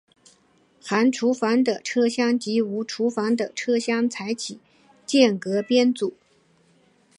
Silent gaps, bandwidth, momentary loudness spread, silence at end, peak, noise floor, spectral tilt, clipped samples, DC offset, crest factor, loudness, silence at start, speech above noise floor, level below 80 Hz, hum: none; 11 kHz; 9 LU; 1.1 s; -2 dBFS; -61 dBFS; -4.5 dB/octave; under 0.1%; under 0.1%; 22 dB; -23 LUFS; 0.85 s; 39 dB; -76 dBFS; none